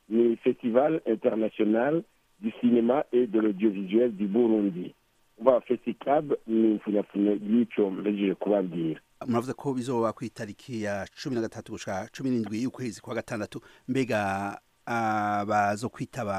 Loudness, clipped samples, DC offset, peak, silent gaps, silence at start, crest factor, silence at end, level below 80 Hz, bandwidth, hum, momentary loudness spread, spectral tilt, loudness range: -27 LUFS; under 0.1%; under 0.1%; -6 dBFS; none; 0.1 s; 20 dB; 0 s; -68 dBFS; 13 kHz; none; 11 LU; -7 dB/octave; 6 LU